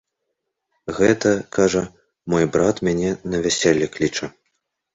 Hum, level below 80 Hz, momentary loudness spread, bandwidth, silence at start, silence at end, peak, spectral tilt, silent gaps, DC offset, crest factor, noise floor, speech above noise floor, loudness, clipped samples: none; -48 dBFS; 14 LU; 8.2 kHz; 0.85 s; 0.65 s; -2 dBFS; -4.5 dB/octave; none; under 0.1%; 20 dB; -77 dBFS; 58 dB; -20 LUFS; under 0.1%